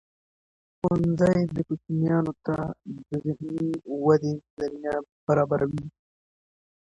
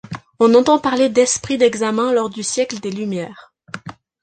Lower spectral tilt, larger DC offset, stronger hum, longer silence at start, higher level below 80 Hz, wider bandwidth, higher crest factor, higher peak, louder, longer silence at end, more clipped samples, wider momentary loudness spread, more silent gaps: first, -9 dB/octave vs -4 dB/octave; neither; neither; first, 0.85 s vs 0.1 s; about the same, -56 dBFS vs -56 dBFS; about the same, 9.4 kHz vs 9.4 kHz; about the same, 18 dB vs 16 dB; second, -8 dBFS vs -2 dBFS; second, -26 LUFS vs -17 LUFS; first, 0.95 s vs 0.3 s; neither; second, 11 LU vs 20 LU; first, 4.50-4.57 s, 5.12-5.27 s vs none